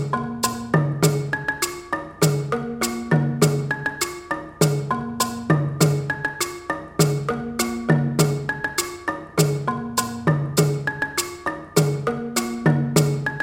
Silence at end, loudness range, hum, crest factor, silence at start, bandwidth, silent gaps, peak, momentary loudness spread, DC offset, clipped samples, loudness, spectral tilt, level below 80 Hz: 0 s; 1 LU; none; 20 dB; 0 s; 16.5 kHz; none; -2 dBFS; 7 LU; under 0.1%; under 0.1%; -22 LUFS; -5 dB/octave; -52 dBFS